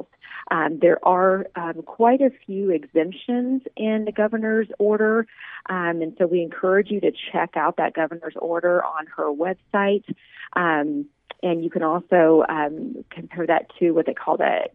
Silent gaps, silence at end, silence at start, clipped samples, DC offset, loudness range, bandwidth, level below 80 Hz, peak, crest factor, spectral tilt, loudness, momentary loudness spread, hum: none; 0.05 s; 0 s; under 0.1%; under 0.1%; 3 LU; 3.9 kHz; -70 dBFS; -4 dBFS; 18 dB; -10 dB/octave; -22 LUFS; 12 LU; none